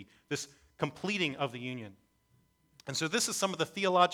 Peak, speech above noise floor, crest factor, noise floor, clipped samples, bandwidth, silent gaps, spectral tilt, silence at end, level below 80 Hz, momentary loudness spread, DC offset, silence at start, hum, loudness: -10 dBFS; 38 dB; 24 dB; -70 dBFS; under 0.1%; 20 kHz; none; -3 dB/octave; 0 s; -74 dBFS; 14 LU; under 0.1%; 0 s; none; -33 LUFS